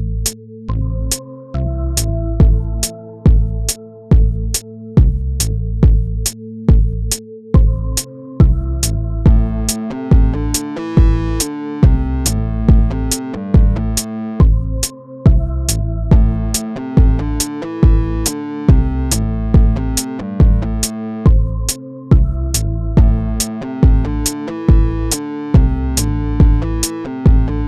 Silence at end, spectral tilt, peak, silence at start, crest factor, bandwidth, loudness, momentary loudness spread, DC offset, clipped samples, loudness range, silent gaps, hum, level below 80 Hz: 0 s; -5.5 dB/octave; 0 dBFS; 0 s; 14 dB; 14.5 kHz; -16 LUFS; 7 LU; 0.2%; under 0.1%; 1 LU; none; none; -16 dBFS